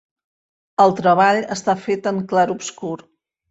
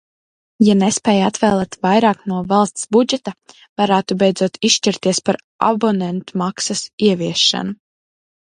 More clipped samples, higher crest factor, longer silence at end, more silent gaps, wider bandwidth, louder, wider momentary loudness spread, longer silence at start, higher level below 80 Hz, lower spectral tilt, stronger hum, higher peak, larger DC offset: neither; about the same, 18 dB vs 16 dB; second, 0.55 s vs 0.75 s; second, none vs 3.69-3.76 s, 5.44-5.59 s, 6.93-6.98 s; second, 8 kHz vs 11 kHz; about the same, -18 LUFS vs -16 LUFS; first, 14 LU vs 8 LU; first, 0.8 s vs 0.6 s; second, -62 dBFS vs -56 dBFS; about the same, -5 dB/octave vs -4 dB/octave; neither; about the same, -2 dBFS vs 0 dBFS; neither